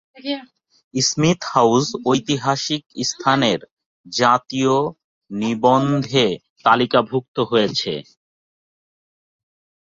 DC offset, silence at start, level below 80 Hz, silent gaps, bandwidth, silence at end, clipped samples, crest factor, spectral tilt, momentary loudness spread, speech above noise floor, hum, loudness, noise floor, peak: under 0.1%; 0.25 s; -58 dBFS; 0.84-0.91 s, 2.86-2.90 s, 3.71-3.77 s, 3.86-4.04 s, 5.04-5.21 s, 6.50-6.56 s, 7.28-7.35 s; 8 kHz; 1.8 s; under 0.1%; 20 dB; -4.5 dB/octave; 11 LU; over 71 dB; none; -19 LUFS; under -90 dBFS; 0 dBFS